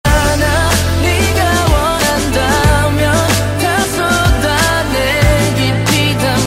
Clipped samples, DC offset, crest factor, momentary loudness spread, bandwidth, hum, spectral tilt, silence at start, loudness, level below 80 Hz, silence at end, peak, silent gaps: under 0.1%; under 0.1%; 12 dB; 2 LU; 16.5 kHz; none; -4.5 dB/octave; 0.05 s; -12 LUFS; -20 dBFS; 0 s; 0 dBFS; none